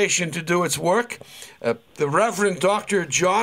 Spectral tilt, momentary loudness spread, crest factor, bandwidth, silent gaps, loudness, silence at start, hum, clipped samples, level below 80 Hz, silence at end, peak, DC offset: -3.5 dB/octave; 9 LU; 16 dB; 16 kHz; none; -22 LUFS; 0 s; none; under 0.1%; -62 dBFS; 0 s; -6 dBFS; under 0.1%